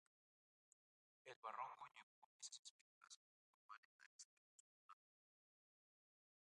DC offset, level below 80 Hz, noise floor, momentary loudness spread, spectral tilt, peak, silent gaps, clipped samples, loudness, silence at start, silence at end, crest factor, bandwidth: under 0.1%; under -90 dBFS; under -90 dBFS; 13 LU; 0.5 dB/octave; -38 dBFS; 1.36-1.42 s, 2.03-2.40 s, 2.59-2.63 s, 2.70-3.01 s, 3.16-3.69 s, 3.78-3.99 s, 4.06-4.19 s, 4.25-4.89 s; under 0.1%; -60 LUFS; 1.25 s; 1.55 s; 26 dB; 11 kHz